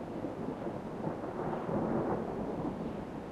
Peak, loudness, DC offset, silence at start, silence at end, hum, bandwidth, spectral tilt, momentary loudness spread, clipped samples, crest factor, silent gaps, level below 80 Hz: -20 dBFS; -37 LUFS; under 0.1%; 0 s; 0 s; none; 13 kHz; -8.5 dB/octave; 7 LU; under 0.1%; 16 dB; none; -56 dBFS